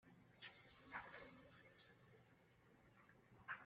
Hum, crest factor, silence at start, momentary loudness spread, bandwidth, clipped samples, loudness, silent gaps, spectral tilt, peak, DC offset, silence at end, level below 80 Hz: none; 24 dB; 0 s; 13 LU; 5 kHz; under 0.1%; -60 LUFS; none; -2 dB/octave; -38 dBFS; under 0.1%; 0 s; -84 dBFS